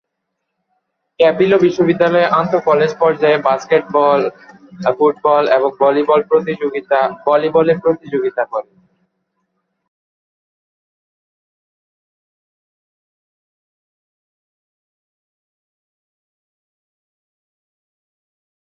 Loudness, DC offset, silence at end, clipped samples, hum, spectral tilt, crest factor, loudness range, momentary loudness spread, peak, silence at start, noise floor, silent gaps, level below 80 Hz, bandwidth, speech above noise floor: -14 LUFS; under 0.1%; 10.1 s; under 0.1%; none; -6.5 dB/octave; 18 dB; 8 LU; 7 LU; 0 dBFS; 1.2 s; -75 dBFS; none; -62 dBFS; 6.8 kHz; 61 dB